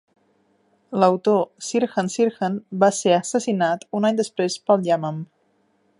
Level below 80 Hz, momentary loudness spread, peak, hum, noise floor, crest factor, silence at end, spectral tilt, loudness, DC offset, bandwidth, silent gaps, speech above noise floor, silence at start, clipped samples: -74 dBFS; 8 LU; -2 dBFS; none; -65 dBFS; 20 dB; 0.75 s; -5 dB/octave; -21 LUFS; under 0.1%; 11.5 kHz; none; 44 dB; 0.9 s; under 0.1%